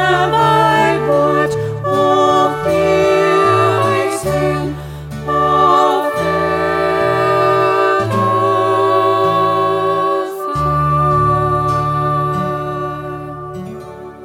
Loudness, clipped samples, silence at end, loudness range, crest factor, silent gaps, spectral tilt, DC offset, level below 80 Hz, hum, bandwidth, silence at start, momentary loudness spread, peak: -14 LUFS; under 0.1%; 0 s; 3 LU; 12 dB; none; -6 dB/octave; under 0.1%; -38 dBFS; none; 16.5 kHz; 0 s; 12 LU; -2 dBFS